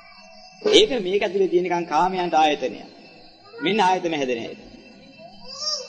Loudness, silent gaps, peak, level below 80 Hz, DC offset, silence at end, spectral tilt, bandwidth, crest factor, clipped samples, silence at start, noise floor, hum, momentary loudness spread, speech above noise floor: -21 LUFS; none; 0 dBFS; -54 dBFS; under 0.1%; 0 s; -3.5 dB/octave; 9.4 kHz; 22 dB; under 0.1%; 0.35 s; -47 dBFS; none; 14 LU; 26 dB